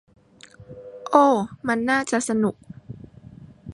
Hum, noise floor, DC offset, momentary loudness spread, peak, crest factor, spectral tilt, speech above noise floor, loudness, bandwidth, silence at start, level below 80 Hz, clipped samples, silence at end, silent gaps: none; -49 dBFS; under 0.1%; 25 LU; -2 dBFS; 22 dB; -5 dB/octave; 29 dB; -21 LUFS; 11.5 kHz; 0.6 s; -58 dBFS; under 0.1%; 0 s; none